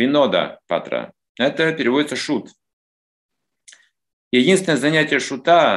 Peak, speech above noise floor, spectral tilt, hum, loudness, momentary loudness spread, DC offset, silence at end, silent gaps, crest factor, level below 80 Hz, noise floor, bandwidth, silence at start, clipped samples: -2 dBFS; 33 dB; -4.5 dB/octave; none; -18 LUFS; 10 LU; under 0.1%; 0 s; 1.29-1.35 s, 2.73-3.29 s, 4.13-4.31 s; 18 dB; -68 dBFS; -51 dBFS; 12.5 kHz; 0 s; under 0.1%